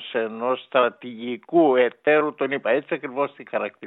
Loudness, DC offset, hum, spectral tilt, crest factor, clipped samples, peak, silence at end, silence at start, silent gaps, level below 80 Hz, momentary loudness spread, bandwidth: -23 LUFS; under 0.1%; none; -9 dB/octave; 18 dB; under 0.1%; -6 dBFS; 0 s; 0 s; none; -84 dBFS; 10 LU; 4.1 kHz